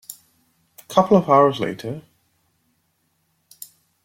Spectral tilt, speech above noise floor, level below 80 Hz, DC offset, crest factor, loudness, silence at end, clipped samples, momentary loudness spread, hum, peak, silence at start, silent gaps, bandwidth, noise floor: -6.5 dB/octave; 51 dB; -62 dBFS; under 0.1%; 20 dB; -18 LUFS; 2.05 s; under 0.1%; 26 LU; none; -2 dBFS; 0.1 s; none; 16.5 kHz; -68 dBFS